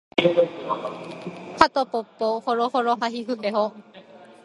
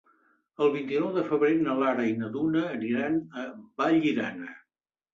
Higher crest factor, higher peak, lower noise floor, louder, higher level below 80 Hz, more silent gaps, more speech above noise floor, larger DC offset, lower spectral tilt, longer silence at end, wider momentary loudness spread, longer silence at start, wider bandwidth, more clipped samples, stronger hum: first, 24 dB vs 14 dB; first, 0 dBFS vs -12 dBFS; second, -47 dBFS vs -86 dBFS; first, -23 LUFS vs -27 LUFS; first, -60 dBFS vs -70 dBFS; neither; second, 23 dB vs 59 dB; neither; second, -5 dB/octave vs -7.5 dB/octave; second, 0.15 s vs 0.55 s; about the same, 15 LU vs 14 LU; second, 0.15 s vs 0.6 s; first, 11.5 kHz vs 7.2 kHz; neither; neither